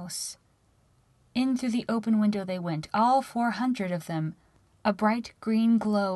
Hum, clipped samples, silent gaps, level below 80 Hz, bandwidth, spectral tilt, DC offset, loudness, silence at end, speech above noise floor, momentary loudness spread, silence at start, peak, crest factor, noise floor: none; under 0.1%; none; -64 dBFS; 12.5 kHz; -5.5 dB/octave; under 0.1%; -28 LUFS; 0 s; 38 dB; 10 LU; 0 s; -12 dBFS; 16 dB; -65 dBFS